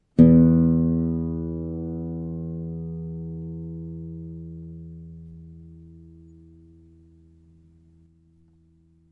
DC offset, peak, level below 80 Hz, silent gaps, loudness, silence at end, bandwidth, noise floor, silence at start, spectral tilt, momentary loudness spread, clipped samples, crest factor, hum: under 0.1%; -2 dBFS; -46 dBFS; none; -23 LUFS; 3 s; 2.4 kHz; -59 dBFS; 0.15 s; -12.5 dB/octave; 27 LU; under 0.1%; 22 dB; none